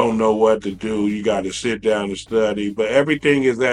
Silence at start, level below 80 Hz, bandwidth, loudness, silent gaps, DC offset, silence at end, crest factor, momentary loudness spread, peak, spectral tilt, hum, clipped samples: 0 s; -50 dBFS; 11 kHz; -19 LUFS; none; under 0.1%; 0 s; 18 dB; 6 LU; -2 dBFS; -5 dB/octave; none; under 0.1%